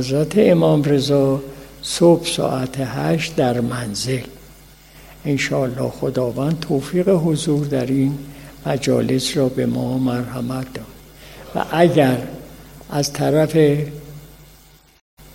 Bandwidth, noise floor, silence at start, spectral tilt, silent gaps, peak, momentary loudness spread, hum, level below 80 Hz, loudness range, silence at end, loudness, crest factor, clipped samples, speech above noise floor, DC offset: 16.5 kHz; -48 dBFS; 0 s; -6 dB/octave; 15.01-15.17 s; -2 dBFS; 16 LU; none; -46 dBFS; 4 LU; 0.1 s; -19 LUFS; 18 dB; under 0.1%; 31 dB; under 0.1%